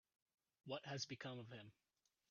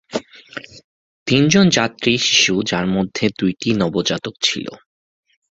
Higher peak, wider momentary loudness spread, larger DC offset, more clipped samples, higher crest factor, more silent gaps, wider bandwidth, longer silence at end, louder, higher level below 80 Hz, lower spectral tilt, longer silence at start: second, -34 dBFS vs 0 dBFS; second, 15 LU vs 20 LU; neither; neither; about the same, 20 dB vs 18 dB; second, none vs 0.84-1.26 s; second, 7 kHz vs 8 kHz; second, 0.6 s vs 0.8 s; second, -51 LUFS vs -16 LUFS; second, -90 dBFS vs -50 dBFS; about the same, -3.5 dB/octave vs -4 dB/octave; first, 0.65 s vs 0.1 s